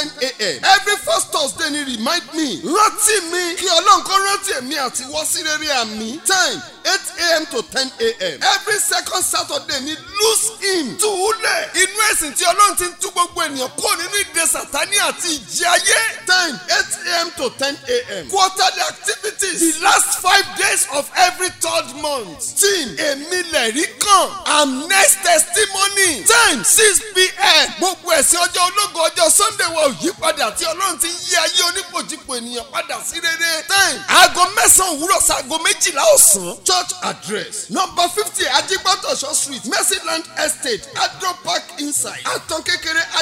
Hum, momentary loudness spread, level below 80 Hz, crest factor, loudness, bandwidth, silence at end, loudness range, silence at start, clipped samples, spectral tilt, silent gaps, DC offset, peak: none; 10 LU; -50 dBFS; 18 dB; -15 LUFS; 16.5 kHz; 0 s; 6 LU; 0 s; under 0.1%; 0 dB/octave; none; under 0.1%; 0 dBFS